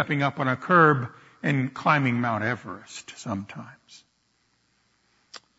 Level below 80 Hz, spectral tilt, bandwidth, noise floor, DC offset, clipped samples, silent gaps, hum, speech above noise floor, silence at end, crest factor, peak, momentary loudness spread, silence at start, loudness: -68 dBFS; -6.5 dB/octave; 8 kHz; -69 dBFS; under 0.1%; under 0.1%; none; none; 45 dB; 0.2 s; 20 dB; -6 dBFS; 21 LU; 0 s; -24 LUFS